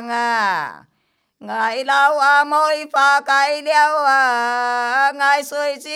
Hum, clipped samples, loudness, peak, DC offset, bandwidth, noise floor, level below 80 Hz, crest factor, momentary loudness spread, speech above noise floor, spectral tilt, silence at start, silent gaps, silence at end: none; under 0.1%; -16 LUFS; -2 dBFS; under 0.1%; 16 kHz; -67 dBFS; -80 dBFS; 14 dB; 8 LU; 51 dB; -1 dB/octave; 0 s; none; 0 s